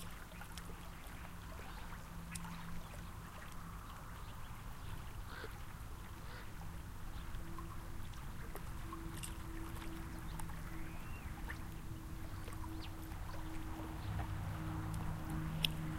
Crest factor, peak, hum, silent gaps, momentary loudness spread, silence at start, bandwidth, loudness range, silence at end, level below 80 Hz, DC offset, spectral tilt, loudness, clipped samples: 30 dB; -14 dBFS; none; none; 8 LU; 0 s; 16 kHz; 5 LU; 0 s; -50 dBFS; under 0.1%; -4.5 dB/octave; -48 LUFS; under 0.1%